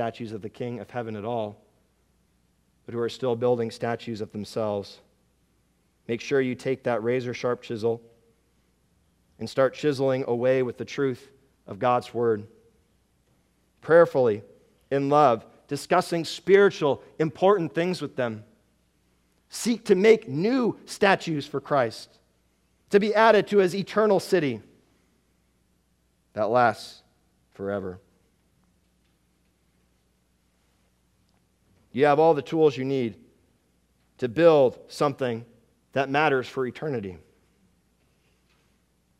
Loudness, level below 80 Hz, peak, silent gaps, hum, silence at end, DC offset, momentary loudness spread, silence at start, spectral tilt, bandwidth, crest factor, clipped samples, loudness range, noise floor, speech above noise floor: -24 LUFS; -68 dBFS; -4 dBFS; none; none; 2 s; under 0.1%; 16 LU; 0 s; -6 dB/octave; 13.5 kHz; 22 dB; under 0.1%; 7 LU; -68 dBFS; 44 dB